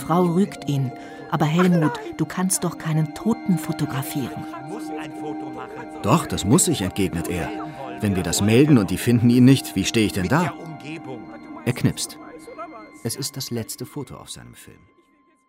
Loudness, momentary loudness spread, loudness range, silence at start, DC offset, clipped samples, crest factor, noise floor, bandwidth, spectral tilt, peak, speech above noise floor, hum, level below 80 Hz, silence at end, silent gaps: -22 LUFS; 18 LU; 10 LU; 0 s; under 0.1%; under 0.1%; 18 dB; -59 dBFS; 16 kHz; -5.5 dB/octave; -4 dBFS; 38 dB; none; -50 dBFS; 0.85 s; none